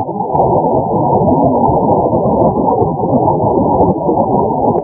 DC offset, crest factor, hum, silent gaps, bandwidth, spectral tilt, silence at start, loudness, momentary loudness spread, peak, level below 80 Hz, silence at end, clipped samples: under 0.1%; 12 dB; none; none; 1.9 kHz; -17.5 dB/octave; 0 s; -12 LUFS; 2 LU; 0 dBFS; -32 dBFS; 0 s; under 0.1%